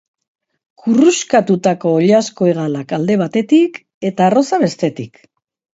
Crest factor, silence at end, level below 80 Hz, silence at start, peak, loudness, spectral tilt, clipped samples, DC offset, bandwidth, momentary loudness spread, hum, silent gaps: 14 dB; 0.65 s; -62 dBFS; 0.85 s; 0 dBFS; -15 LUFS; -6 dB/octave; under 0.1%; under 0.1%; 8 kHz; 10 LU; none; 3.94-4.01 s